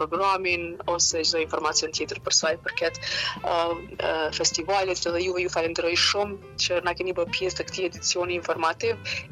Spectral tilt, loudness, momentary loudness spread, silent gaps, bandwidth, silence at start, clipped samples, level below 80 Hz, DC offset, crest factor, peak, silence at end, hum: -1.5 dB/octave; -25 LUFS; 7 LU; none; 12.5 kHz; 0 s; under 0.1%; -52 dBFS; under 0.1%; 18 dB; -8 dBFS; 0 s; none